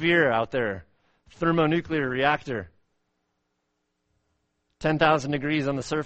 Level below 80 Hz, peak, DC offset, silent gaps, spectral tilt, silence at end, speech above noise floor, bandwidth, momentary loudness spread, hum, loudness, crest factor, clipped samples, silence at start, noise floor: -54 dBFS; -6 dBFS; under 0.1%; none; -6 dB/octave; 0 s; 53 dB; 8.4 kHz; 9 LU; none; -25 LUFS; 20 dB; under 0.1%; 0 s; -77 dBFS